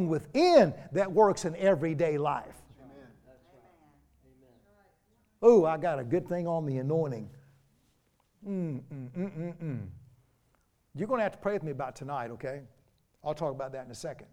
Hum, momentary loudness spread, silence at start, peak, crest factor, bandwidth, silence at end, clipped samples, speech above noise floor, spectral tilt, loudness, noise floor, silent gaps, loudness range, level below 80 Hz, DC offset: none; 19 LU; 0 s; -8 dBFS; 22 dB; 12.5 kHz; 0.1 s; under 0.1%; 42 dB; -6.5 dB/octave; -29 LUFS; -71 dBFS; none; 11 LU; -66 dBFS; under 0.1%